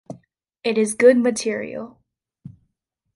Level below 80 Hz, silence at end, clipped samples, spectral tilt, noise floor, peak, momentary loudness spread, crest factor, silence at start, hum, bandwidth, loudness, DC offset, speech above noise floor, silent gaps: -66 dBFS; 0.7 s; under 0.1%; -4 dB/octave; -76 dBFS; -2 dBFS; 25 LU; 20 dB; 0.1 s; none; 11.5 kHz; -19 LUFS; under 0.1%; 57 dB; none